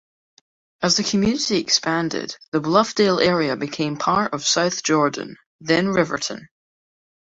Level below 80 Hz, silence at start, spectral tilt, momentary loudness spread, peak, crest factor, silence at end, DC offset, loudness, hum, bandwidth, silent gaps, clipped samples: -56 dBFS; 0.8 s; -3.5 dB/octave; 9 LU; -2 dBFS; 20 dB; 0.95 s; under 0.1%; -20 LUFS; none; 8 kHz; 2.48-2.52 s, 5.46-5.59 s; under 0.1%